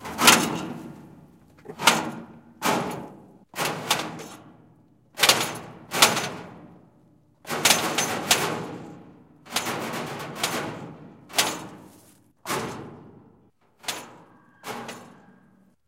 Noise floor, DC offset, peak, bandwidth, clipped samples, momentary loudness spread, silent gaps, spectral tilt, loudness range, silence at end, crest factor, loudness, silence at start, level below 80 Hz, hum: -60 dBFS; under 0.1%; 0 dBFS; 16.5 kHz; under 0.1%; 23 LU; none; -1.5 dB/octave; 13 LU; 0.75 s; 28 dB; -24 LUFS; 0 s; -64 dBFS; none